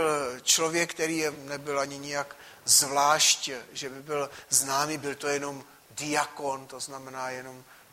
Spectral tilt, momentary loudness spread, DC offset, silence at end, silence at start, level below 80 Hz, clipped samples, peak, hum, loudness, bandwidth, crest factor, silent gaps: -1 dB/octave; 17 LU; under 0.1%; 0.15 s; 0 s; -70 dBFS; under 0.1%; -6 dBFS; none; -27 LUFS; 16 kHz; 22 dB; none